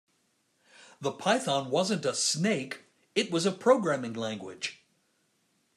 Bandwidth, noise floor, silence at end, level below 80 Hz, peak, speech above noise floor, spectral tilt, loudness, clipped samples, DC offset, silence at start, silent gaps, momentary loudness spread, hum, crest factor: 13.5 kHz; -73 dBFS; 1 s; -80 dBFS; -10 dBFS; 44 dB; -3.5 dB/octave; -29 LUFS; under 0.1%; under 0.1%; 1 s; none; 12 LU; none; 22 dB